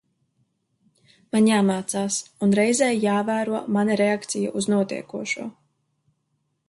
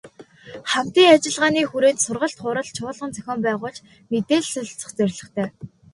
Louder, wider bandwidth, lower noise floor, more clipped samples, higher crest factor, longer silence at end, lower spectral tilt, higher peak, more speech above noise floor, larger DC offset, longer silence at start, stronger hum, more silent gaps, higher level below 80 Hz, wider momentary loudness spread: about the same, -22 LUFS vs -21 LUFS; about the same, 11.5 kHz vs 11.5 kHz; first, -73 dBFS vs -44 dBFS; neither; about the same, 16 dB vs 20 dB; first, 1.2 s vs 0.25 s; about the same, -4.5 dB/octave vs -3.5 dB/octave; second, -8 dBFS vs 0 dBFS; first, 51 dB vs 23 dB; neither; first, 1.35 s vs 0.05 s; neither; neither; second, -68 dBFS vs -62 dBFS; second, 9 LU vs 16 LU